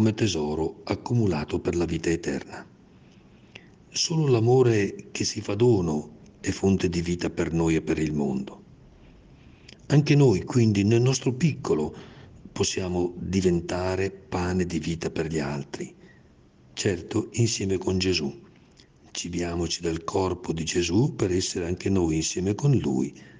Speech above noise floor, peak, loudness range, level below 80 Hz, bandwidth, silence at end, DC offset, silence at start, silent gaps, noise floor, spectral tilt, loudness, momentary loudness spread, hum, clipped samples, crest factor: 30 dB; -6 dBFS; 5 LU; -52 dBFS; 10 kHz; 0 s; under 0.1%; 0 s; none; -55 dBFS; -5.5 dB/octave; -25 LUFS; 11 LU; none; under 0.1%; 18 dB